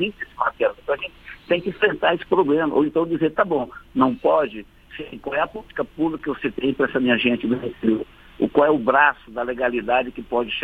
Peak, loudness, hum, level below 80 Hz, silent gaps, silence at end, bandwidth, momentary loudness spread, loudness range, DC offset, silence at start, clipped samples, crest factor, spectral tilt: -2 dBFS; -21 LUFS; none; -50 dBFS; none; 0 s; 4.8 kHz; 11 LU; 3 LU; under 0.1%; 0 s; under 0.1%; 20 dB; -7.5 dB/octave